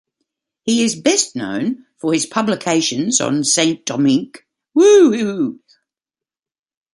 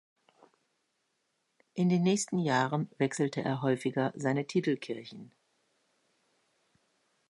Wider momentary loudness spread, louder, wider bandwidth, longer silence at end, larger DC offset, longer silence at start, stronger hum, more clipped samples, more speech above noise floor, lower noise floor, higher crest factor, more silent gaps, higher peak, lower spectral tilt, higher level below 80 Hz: about the same, 12 LU vs 13 LU; first, -16 LUFS vs -31 LUFS; about the same, 11.5 kHz vs 11.5 kHz; second, 1.4 s vs 2.05 s; neither; second, 0.65 s vs 1.75 s; neither; neither; first, over 74 dB vs 49 dB; first, under -90 dBFS vs -79 dBFS; about the same, 16 dB vs 20 dB; neither; first, 0 dBFS vs -14 dBFS; second, -3.5 dB/octave vs -5.5 dB/octave; first, -62 dBFS vs -78 dBFS